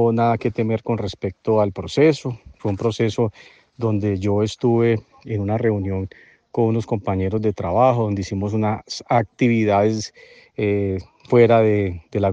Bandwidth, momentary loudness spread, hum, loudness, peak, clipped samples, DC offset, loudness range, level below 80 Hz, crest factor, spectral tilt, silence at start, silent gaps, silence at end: 8.2 kHz; 10 LU; none; -20 LUFS; -2 dBFS; under 0.1%; under 0.1%; 3 LU; -54 dBFS; 18 dB; -7.5 dB/octave; 0 s; none; 0 s